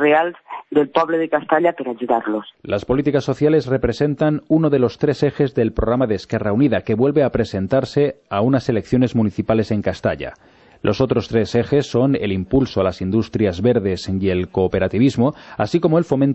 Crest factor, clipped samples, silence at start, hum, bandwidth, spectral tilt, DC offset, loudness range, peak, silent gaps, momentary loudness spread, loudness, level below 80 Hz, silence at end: 16 dB; under 0.1%; 0 s; none; 8.4 kHz; -7.5 dB/octave; under 0.1%; 2 LU; -2 dBFS; none; 5 LU; -19 LUFS; -40 dBFS; 0 s